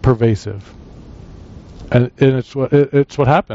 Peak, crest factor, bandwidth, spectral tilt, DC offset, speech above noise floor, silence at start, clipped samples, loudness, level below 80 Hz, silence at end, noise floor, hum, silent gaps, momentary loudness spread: -2 dBFS; 14 dB; 7.8 kHz; -7.5 dB/octave; under 0.1%; 22 dB; 0.05 s; under 0.1%; -15 LUFS; -38 dBFS; 0 s; -36 dBFS; none; none; 15 LU